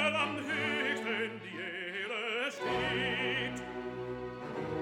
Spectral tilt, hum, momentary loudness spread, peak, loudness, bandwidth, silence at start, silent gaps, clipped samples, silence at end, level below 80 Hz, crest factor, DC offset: -4.5 dB/octave; none; 9 LU; -16 dBFS; -34 LUFS; 17 kHz; 0 s; none; under 0.1%; 0 s; -62 dBFS; 18 dB; under 0.1%